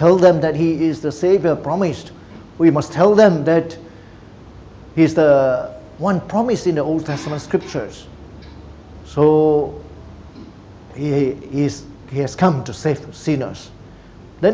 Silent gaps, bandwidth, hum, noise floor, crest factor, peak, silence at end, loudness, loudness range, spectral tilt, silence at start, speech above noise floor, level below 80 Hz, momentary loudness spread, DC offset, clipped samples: none; 8 kHz; none; -40 dBFS; 18 dB; 0 dBFS; 0 s; -17 LUFS; 6 LU; -7 dB/octave; 0 s; 24 dB; -44 dBFS; 24 LU; under 0.1%; under 0.1%